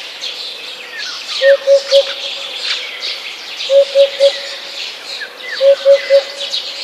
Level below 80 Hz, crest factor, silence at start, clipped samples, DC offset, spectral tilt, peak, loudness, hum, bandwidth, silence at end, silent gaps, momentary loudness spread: -70 dBFS; 14 dB; 0 s; under 0.1%; under 0.1%; 1 dB/octave; 0 dBFS; -14 LUFS; none; 13.5 kHz; 0 s; none; 14 LU